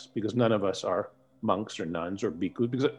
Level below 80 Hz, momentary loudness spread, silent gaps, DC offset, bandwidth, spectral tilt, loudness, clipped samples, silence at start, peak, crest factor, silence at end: -66 dBFS; 8 LU; none; under 0.1%; 11 kHz; -6.5 dB/octave; -30 LUFS; under 0.1%; 0 s; -10 dBFS; 20 dB; 0 s